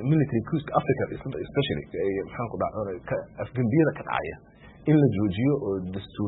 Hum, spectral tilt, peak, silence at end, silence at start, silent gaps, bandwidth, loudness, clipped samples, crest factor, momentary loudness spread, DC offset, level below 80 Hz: none; -12 dB/octave; -8 dBFS; 0 s; 0 s; none; 4.1 kHz; -27 LUFS; under 0.1%; 18 dB; 11 LU; under 0.1%; -52 dBFS